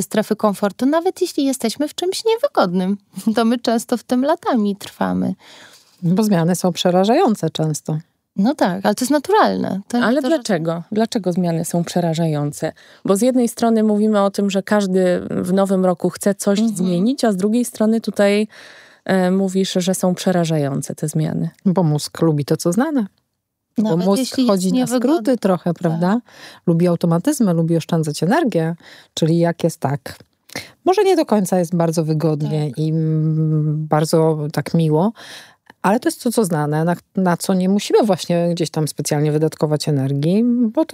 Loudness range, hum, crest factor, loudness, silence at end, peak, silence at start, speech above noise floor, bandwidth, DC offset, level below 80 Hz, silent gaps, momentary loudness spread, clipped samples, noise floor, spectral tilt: 2 LU; none; 16 dB; -18 LUFS; 0.1 s; -2 dBFS; 0 s; 56 dB; 16 kHz; under 0.1%; -64 dBFS; none; 6 LU; under 0.1%; -74 dBFS; -6 dB/octave